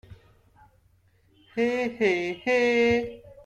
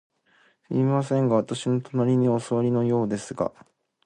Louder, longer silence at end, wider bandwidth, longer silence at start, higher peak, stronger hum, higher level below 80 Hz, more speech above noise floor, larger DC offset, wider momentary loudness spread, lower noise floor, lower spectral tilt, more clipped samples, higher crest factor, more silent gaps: about the same, -25 LUFS vs -24 LUFS; second, 0.1 s vs 0.55 s; about the same, 9.4 kHz vs 10 kHz; second, 0.1 s vs 0.7 s; second, -12 dBFS vs -8 dBFS; neither; first, -58 dBFS vs -64 dBFS; about the same, 39 dB vs 39 dB; neither; about the same, 9 LU vs 8 LU; about the same, -63 dBFS vs -62 dBFS; second, -5 dB/octave vs -7.5 dB/octave; neither; about the same, 16 dB vs 16 dB; neither